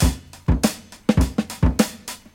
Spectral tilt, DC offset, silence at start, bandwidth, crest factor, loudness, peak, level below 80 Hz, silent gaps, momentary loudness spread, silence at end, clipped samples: -5.5 dB/octave; under 0.1%; 0 s; 17 kHz; 20 dB; -22 LUFS; -2 dBFS; -26 dBFS; none; 6 LU; 0.2 s; under 0.1%